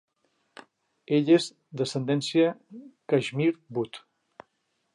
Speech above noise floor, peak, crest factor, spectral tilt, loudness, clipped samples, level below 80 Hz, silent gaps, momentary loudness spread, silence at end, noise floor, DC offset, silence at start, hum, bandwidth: 50 dB; -10 dBFS; 18 dB; -6 dB/octave; -26 LUFS; under 0.1%; -78 dBFS; none; 21 LU; 0.95 s; -75 dBFS; under 0.1%; 1.1 s; none; 11.5 kHz